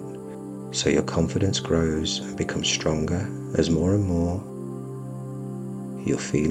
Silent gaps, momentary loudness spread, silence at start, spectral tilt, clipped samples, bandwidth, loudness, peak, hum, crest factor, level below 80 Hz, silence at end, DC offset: none; 12 LU; 0 s; -5 dB/octave; under 0.1%; 14 kHz; -25 LUFS; -6 dBFS; none; 18 dB; -44 dBFS; 0 s; under 0.1%